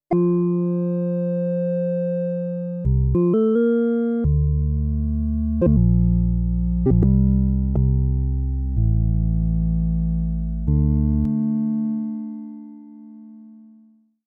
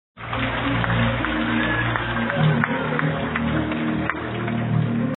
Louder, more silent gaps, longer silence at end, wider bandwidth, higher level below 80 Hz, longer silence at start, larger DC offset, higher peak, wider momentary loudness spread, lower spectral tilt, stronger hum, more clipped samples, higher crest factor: about the same, -21 LUFS vs -22 LUFS; neither; first, 0.7 s vs 0 s; second, 3.3 kHz vs 4.2 kHz; first, -26 dBFS vs -40 dBFS; about the same, 0.1 s vs 0.15 s; neither; second, -8 dBFS vs 0 dBFS; about the same, 7 LU vs 5 LU; first, -13.5 dB/octave vs -5 dB/octave; neither; neither; second, 12 dB vs 22 dB